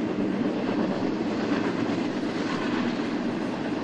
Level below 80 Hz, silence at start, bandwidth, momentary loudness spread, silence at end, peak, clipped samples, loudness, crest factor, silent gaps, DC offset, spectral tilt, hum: -58 dBFS; 0 s; 9.2 kHz; 2 LU; 0 s; -14 dBFS; under 0.1%; -27 LUFS; 14 dB; none; under 0.1%; -6.5 dB/octave; none